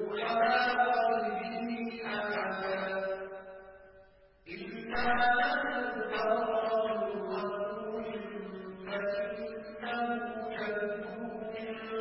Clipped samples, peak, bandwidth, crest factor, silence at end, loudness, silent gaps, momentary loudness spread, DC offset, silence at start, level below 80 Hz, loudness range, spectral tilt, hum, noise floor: under 0.1%; -16 dBFS; 5.6 kHz; 18 dB; 0 s; -33 LUFS; none; 14 LU; under 0.1%; 0 s; -64 dBFS; 6 LU; -2 dB/octave; none; -60 dBFS